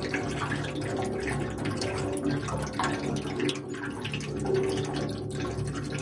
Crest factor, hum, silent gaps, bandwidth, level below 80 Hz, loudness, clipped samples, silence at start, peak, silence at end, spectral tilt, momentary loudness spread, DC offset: 18 dB; none; none; 11.5 kHz; -48 dBFS; -31 LUFS; under 0.1%; 0 s; -12 dBFS; 0 s; -5.5 dB/octave; 4 LU; under 0.1%